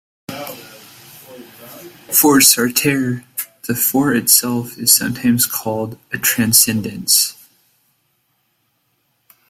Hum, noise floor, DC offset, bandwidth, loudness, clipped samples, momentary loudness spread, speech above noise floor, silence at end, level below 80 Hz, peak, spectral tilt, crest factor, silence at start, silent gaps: none; -65 dBFS; under 0.1%; 16.5 kHz; -14 LUFS; under 0.1%; 17 LU; 50 dB; 2.2 s; -56 dBFS; 0 dBFS; -2.5 dB/octave; 18 dB; 0.3 s; none